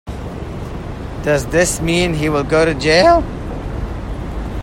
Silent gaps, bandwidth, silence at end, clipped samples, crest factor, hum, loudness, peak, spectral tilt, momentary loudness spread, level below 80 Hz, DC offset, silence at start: none; 16.5 kHz; 0 s; under 0.1%; 16 dB; none; -16 LUFS; 0 dBFS; -4.5 dB/octave; 16 LU; -28 dBFS; under 0.1%; 0.05 s